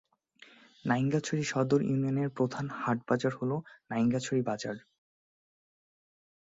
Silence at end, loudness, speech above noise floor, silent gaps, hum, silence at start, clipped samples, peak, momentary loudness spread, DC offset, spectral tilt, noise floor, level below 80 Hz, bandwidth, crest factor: 1.7 s; -31 LUFS; 29 dB; none; none; 0.85 s; under 0.1%; -14 dBFS; 9 LU; under 0.1%; -6.5 dB/octave; -60 dBFS; -70 dBFS; 7.8 kHz; 18 dB